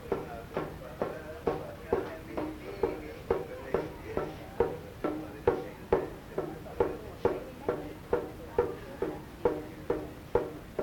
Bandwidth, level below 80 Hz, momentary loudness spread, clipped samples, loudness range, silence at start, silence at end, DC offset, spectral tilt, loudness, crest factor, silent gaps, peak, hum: 18 kHz; -52 dBFS; 7 LU; under 0.1%; 2 LU; 0 s; 0 s; under 0.1%; -7 dB/octave; -35 LUFS; 22 dB; none; -12 dBFS; none